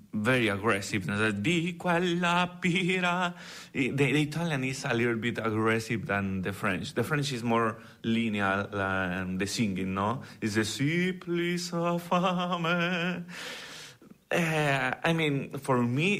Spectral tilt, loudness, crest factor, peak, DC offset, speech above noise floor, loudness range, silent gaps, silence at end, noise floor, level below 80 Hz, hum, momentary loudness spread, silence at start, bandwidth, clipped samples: -5.5 dB/octave; -29 LUFS; 14 dB; -14 dBFS; under 0.1%; 22 dB; 2 LU; none; 0 s; -51 dBFS; -62 dBFS; none; 6 LU; 0.15 s; 15.5 kHz; under 0.1%